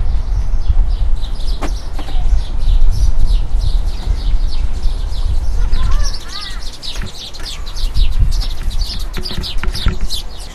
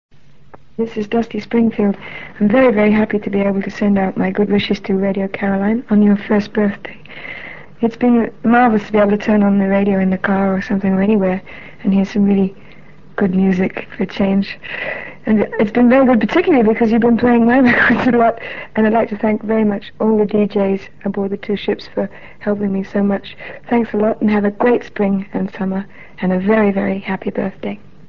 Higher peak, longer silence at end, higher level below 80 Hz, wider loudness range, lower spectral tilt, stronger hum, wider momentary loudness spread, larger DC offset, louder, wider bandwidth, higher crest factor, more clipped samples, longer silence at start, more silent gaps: about the same, 0 dBFS vs -2 dBFS; second, 0 s vs 0.35 s; first, -14 dBFS vs -46 dBFS; second, 3 LU vs 6 LU; second, -4.5 dB/octave vs -8.5 dB/octave; neither; second, 7 LU vs 12 LU; second, under 0.1% vs 1%; second, -21 LUFS vs -16 LUFS; first, 12 kHz vs 6.4 kHz; about the same, 12 dB vs 14 dB; first, 0.1% vs under 0.1%; about the same, 0 s vs 0.1 s; neither